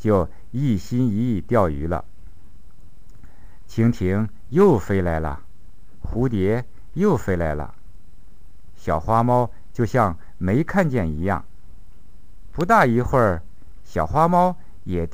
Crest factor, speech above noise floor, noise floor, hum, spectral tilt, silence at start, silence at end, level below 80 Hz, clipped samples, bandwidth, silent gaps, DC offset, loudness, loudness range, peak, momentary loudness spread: 18 dB; 28 dB; -48 dBFS; none; -8.5 dB/octave; 0.05 s; 0.05 s; -38 dBFS; under 0.1%; 15.5 kHz; none; 3%; -21 LUFS; 4 LU; -4 dBFS; 14 LU